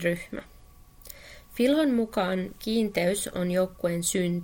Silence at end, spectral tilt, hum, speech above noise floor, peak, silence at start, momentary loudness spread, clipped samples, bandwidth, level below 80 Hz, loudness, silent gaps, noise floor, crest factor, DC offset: 0 s; -5 dB/octave; none; 25 dB; -10 dBFS; 0 s; 19 LU; under 0.1%; 17 kHz; -52 dBFS; -27 LUFS; none; -51 dBFS; 16 dB; under 0.1%